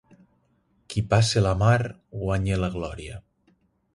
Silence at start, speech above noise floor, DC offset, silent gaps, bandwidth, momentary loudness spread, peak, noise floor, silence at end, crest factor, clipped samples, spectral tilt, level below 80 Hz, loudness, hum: 0.9 s; 43 dB; under 0.1%; none; 11.5 kHz; 16 LU; -6 dBFS; -67 dBFS; 0.75 s; 20 dB; under 0.1%; -5.5 dB/octave; -42 dBFS; -24 LUFS; none